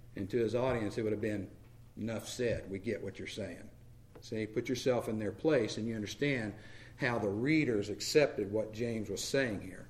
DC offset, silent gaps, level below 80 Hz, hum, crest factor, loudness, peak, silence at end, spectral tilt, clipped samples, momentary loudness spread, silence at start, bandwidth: under 0.1%; none; -58 dBFS; none; 20 dB; -35 LUFS; -14 dBFS; 0 s; -5 dB/octave; under 0.1%; 12 LU; 0 s; 15.5 kHz